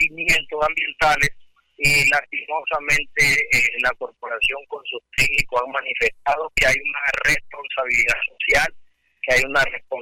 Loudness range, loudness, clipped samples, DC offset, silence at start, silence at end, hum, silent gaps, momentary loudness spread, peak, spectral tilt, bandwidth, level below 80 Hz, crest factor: 2 LU; -19 LUFS; under 0.1%; under 0.1%; 0 s; 0 s; none; none; 9 LU; -10 dBFS; -2 dB/octave; 16.5 kHz; -40 dBFS; 12 dB